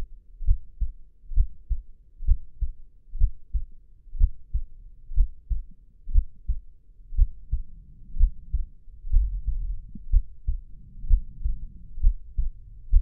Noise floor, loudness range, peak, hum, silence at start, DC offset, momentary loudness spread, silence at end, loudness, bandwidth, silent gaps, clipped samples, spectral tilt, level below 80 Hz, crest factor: -46 dBFS; 2 LU; -6 dBFS; none; 0 s; under 0.1%; 17 LU; 0 s; -32 LUFS; 0.3 kHz; none; under 0.1%; -15.5 dB/octave; -26 dBFS; 18 dB